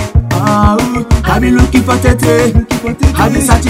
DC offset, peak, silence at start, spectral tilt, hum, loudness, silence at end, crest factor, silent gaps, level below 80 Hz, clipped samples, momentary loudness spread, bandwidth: under 0.1%; 0 dBFS; 0 s; -6 dB/octave; none; -10 LUFS; 0 s; 10 dB; none; -16 dBFS; 2%; 4 LU; 16.5 kHz